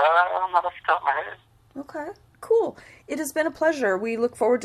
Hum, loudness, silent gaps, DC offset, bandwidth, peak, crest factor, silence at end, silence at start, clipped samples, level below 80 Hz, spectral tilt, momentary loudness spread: none; -24 LUFS; none; under 0.1%; 14 kHz; -6 dBFS; 18 dB; 0 s; 0 s; under 0.1%; -64 dBFS; -3.5 dB/octave; 16 LU